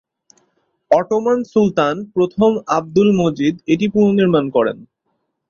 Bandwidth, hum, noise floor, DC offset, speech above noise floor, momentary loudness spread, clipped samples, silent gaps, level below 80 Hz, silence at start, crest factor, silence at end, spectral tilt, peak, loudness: 7.2 kHz; none; -70 dBFS; under 0.1%; 55 dB; 5 LU; under 0.1%; none; -54 dBFS; 0.9 s; 16 dB; 0.65 s; -7 dB/octave; -2 dBFS; -16 LUFS